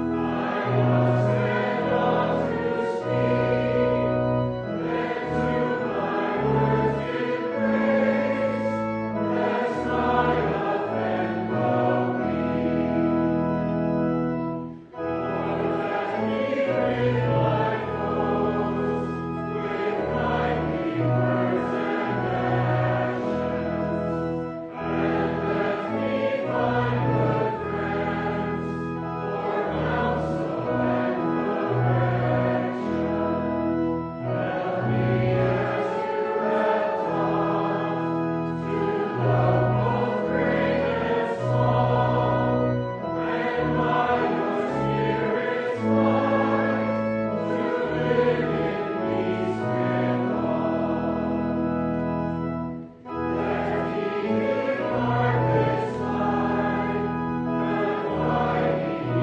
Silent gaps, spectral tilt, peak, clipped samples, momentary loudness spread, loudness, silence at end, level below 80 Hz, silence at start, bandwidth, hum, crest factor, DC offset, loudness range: none; -8.5 dB/octave; -8 dBFS; under 0.1%; 5 LU; -25 LUFS; 0 s; -48 dBFS; 0 s; 7.6 kHz; none; 16 dB; under 0.1%; 3 LU